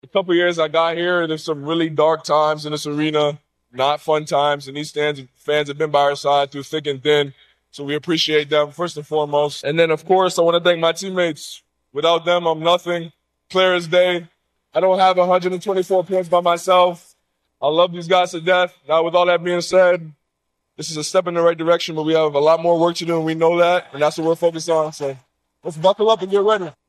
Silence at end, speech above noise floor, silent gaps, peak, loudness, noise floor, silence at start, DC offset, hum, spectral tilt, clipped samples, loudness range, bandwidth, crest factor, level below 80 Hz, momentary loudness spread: 0.15 s; 57 dB; none; -2 dBFS; -18 LUFS; -75 dBFS; 0.15 s; under 0.1%; none; -4.5 dB/octave; under 0.1%; 3 LU; 13 kHz; 16 dB; -68 dBFS; 10 LU